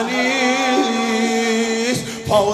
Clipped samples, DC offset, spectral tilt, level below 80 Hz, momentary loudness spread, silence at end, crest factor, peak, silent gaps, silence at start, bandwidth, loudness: under 0.1%; under 0.1%; -3.5 dB/octave; -54 dBFS; 3 LU; 0 s; 14 dB; -4 dBFS; none; 0 s; 15 kHz; -18 LUFS